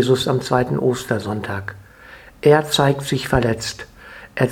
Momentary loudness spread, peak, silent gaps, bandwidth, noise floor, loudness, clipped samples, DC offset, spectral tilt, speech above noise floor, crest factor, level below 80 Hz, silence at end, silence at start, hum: 17 LU; 0 dBFS; none; 18.5 kHz; -43 dBFS; -19 LUFS; under 0.1%; under 0.1%; -5.5 dB/octave; 24 dB; 20 dB; -42 dBFS; 0 s; 0 s; none